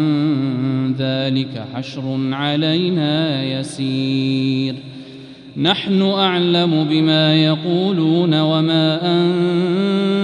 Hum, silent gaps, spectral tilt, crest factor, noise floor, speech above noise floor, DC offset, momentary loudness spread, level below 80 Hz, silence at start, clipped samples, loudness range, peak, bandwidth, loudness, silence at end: none; none; -7 dB/octave; 14 dB; -37 dBFS; 20 dB; under 0.1%; 10 LU; -60 dBFS; 0 s; under 0.1%; 4 LU; -2 dBFS; 10.5 kHz; -17 LUFS; 0 s